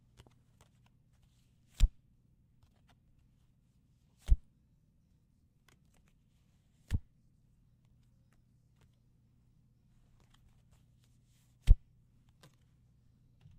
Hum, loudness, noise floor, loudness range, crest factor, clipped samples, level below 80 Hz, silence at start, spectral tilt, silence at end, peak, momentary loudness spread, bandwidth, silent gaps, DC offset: none; -36 LUFS; -70 dBFS; 9 LU; 30 dB; under 0.1%; -40 dBFS; 1.8 s; -6 dB/octave; 1.8 s; -8 dBFS; 10 LU; 9.2 kHz; none; under 0.1%